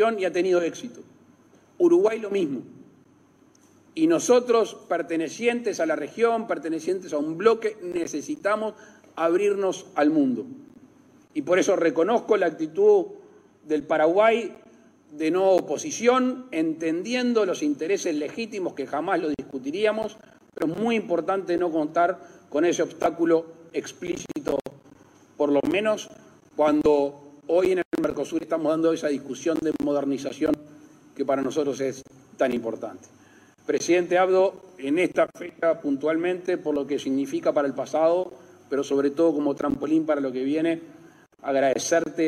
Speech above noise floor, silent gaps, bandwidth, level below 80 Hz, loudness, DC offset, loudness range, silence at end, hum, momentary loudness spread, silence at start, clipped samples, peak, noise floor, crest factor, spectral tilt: 34 dB; 27.85-27.91 s; 14 kHz; -64 dBFS; -24 LUFS; under 0.1%; 4 LU; 0 s; none; 11 LU; 0 s; under 0.1%; -6 dBFS; -57 dBFS; 20 dB; -4.5 dB/octave